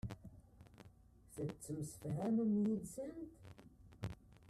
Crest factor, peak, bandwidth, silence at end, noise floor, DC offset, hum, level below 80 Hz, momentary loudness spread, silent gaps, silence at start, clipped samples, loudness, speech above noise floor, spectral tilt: 16 dB; -26 dBFS; 14 kHz; 0 s; -64 dBFS; under 0.1%; none; -64 dBFS; 26 LU; none; 0.05 s; under 0.1%; -42 LUFS; 24 dB; -7.5 dB/octave